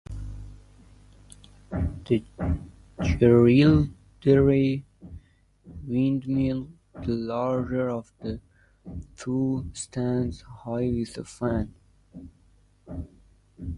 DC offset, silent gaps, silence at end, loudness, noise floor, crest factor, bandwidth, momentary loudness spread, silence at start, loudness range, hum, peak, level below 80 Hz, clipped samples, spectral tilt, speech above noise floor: under 0.1%; none; 0 s; -25 LUFS; -60 dBFS; 20 dB; 11.5 kHz; 23 LU; 0.1 s; 9 LU; none; -6 dBFS; -40 dBFS; under 0.1%; -7.5 dB/octave; 36 dB